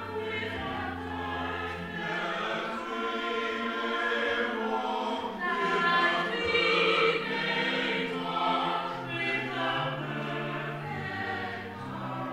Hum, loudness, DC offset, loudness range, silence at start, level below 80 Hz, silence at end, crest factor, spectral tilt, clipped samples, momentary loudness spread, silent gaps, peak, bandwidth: none; -30 LUFS; under 0.1%; 6 LU; 0 s; -60 dBFS; 0 s; 18 dB; -5 dB/octave; under 0.1%; 10 LU; none; -14 dBFS; 15.5 kHz